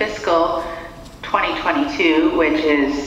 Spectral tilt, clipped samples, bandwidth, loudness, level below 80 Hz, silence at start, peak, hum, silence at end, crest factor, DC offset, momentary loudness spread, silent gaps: -4.5 dB/octave; under 0.1%; 10.5 kHz; -18 LUFS; -42 dBFS; 0 s; -2 dBFS; none; 0 s; 16 dB; under 0.1%; 15 LU; none